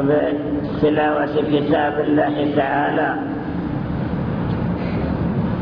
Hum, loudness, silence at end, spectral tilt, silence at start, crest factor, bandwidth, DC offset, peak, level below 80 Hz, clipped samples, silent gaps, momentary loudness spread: none; -20 LUFS; 0 s; -10 dB/octave; 0 s; 14 dB; 5.4 kHz; under 0.1%; -6 dBFS; -38 dBFS; under 0.1%; none; 6 LU